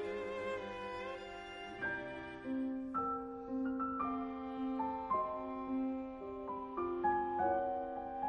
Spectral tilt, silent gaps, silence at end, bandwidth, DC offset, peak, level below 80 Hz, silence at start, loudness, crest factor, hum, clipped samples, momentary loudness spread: -6.5 dB/octave; none; 0 s; 7.8 kHz; under 0.1%; -24 dBFS; -64 dBFS; 0 s; -40 LUFS; 16 dB; none; under 0.1%; 10 LU